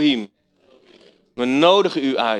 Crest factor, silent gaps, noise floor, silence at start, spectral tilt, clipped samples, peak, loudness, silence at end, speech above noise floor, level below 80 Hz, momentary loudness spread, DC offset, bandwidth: 18 dB; none; -56 dBFS; 0 s; -5 dB/octave; under 0.1%; -2 dBFS; -18 LUFS; 0 s; 39 dB; -66 dBFS; 21 LU; under 0.1%; 9.6 kHz